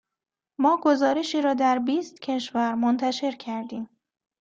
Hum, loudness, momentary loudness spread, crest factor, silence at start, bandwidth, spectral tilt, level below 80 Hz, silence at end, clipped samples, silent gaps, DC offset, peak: none; -24 LUFS; 13 LU; 16 dB; 0.6 s; 7.8 kHz; -4 dB/octave; -72 dBFS; 0.55 s; under 0.1%; none; under 0.1%; -8 dBFS